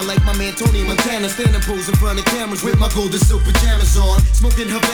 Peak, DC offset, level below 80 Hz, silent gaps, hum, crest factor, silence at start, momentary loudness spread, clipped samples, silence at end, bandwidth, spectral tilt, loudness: 0 dBFS; under 0.1%; -16 dBFS; none; none; 14 dB; 0 s; 4 LU; under 0.1%; 0 s; over 20 kHz; -4.5 dB/octave; -16 LUFS